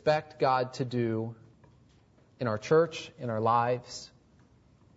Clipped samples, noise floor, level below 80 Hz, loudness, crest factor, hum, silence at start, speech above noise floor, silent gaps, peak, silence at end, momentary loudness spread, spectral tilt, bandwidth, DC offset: under 0.1%; -62 dBFS; -68 dBFS; -30 LUFS; 18 dB; none; 0.05 s; 33 dB; none; -12 dBFS; 0.9 s; 14 LU; -6 dB/octave; 8 kHz; under 0.1%